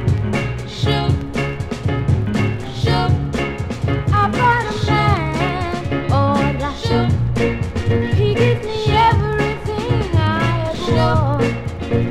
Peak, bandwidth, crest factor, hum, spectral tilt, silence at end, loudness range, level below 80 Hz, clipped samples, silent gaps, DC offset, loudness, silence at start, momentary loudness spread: -2 dBFS; 11.5 kHz; 14 dB; none; -7 dB/octave; 0 s; 2 LU; -30 dBFS; under 0.1%; none; under 0.1%; -18 LUFS; 0 s; 7 LU